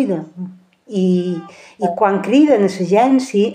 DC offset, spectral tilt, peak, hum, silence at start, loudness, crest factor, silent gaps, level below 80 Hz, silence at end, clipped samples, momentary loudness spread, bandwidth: under 0.1%; -7 dB/octave; -2 dBFS; none; 0 s; -16 LUFS; 14 dB; none; -70 dBFS; 0 s; under 0.1%; 15 LU; 10 kHz